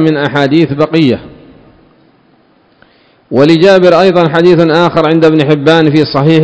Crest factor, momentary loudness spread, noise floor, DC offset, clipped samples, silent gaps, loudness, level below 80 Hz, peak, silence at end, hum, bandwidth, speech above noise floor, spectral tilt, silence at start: 8 dB; 5 LU; -48 dBFS; under 0.1%; 4%; none; -8 LUFS; -46 dBFS; 0 dBFS; 0 s; none; 8 kHz; 41 dB; -7.5 dB/octave; 0 s